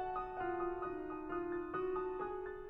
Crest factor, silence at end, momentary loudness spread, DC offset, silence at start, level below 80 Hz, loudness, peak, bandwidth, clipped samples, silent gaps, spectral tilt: 12 dB; 0 s; 3 LU; under 0.1%; 0 s; -60 dBFS; -41 LUFS; -30 dBFS; 4 kHz; under 0.1%; none; -8.5 dB/octave